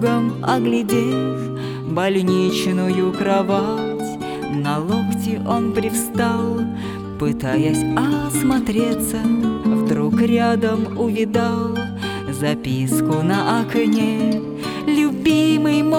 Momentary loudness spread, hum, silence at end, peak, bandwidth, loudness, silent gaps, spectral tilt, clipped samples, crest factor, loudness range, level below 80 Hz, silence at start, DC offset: 7 LU; none; 0 s; -4 dBFS; 19 kHz; -19 LUFS; none; -6 dB/octave; under 0.1%; 14 dB; 2 LU; -46 dBFS; 0 s; under 0.1%